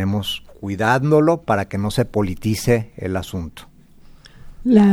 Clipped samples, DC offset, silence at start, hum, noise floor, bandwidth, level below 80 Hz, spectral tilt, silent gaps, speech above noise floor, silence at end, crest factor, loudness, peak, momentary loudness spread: under 0.1%; under 0.1%; 0 s; none; -45 dBFS; 16.5 kHz; -42 dBFS; -6.5 dB/octave; none; 26 dB; 0 s; 18 dB; -20 LUFS; -2 dBFS; 13 LU